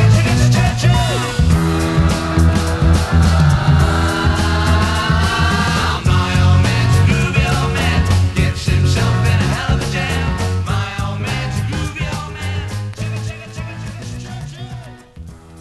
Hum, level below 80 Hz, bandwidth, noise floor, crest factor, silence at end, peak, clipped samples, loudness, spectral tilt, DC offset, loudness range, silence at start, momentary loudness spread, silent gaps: none; -22 dBFS; 12.5 kHz; -35 dBFS; 14 dB; 0 s; 0 dBFS; under 0.1%; -15 LUFS; -5.5 dB/octave; under 0.1%; 9 LU; 0 s; 14 LU; none